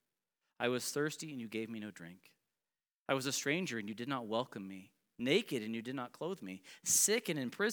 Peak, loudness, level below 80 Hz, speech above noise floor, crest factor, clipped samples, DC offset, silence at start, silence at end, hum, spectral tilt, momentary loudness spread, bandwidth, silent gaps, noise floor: -16 dBFS; -36 LUFS; -90 dBFS; over 52 dB; 24 dB; under 0.1%; under 0.1%; 0.6 s; 0 s; none; -2.5 dB/octave; 17 LU; over 20 kHz; 2.98-3.06 s; under -90 dBFS